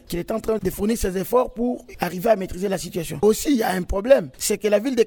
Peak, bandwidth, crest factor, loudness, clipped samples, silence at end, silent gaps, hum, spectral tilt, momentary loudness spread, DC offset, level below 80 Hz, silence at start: -4 dBFS; over 20 kHz; 18 dB; -22 LUFS; under 0.1%; 0 s; none; none; -5 dB/octave; 8 LU; under 0.1%; -38 dBFS; 0.1 s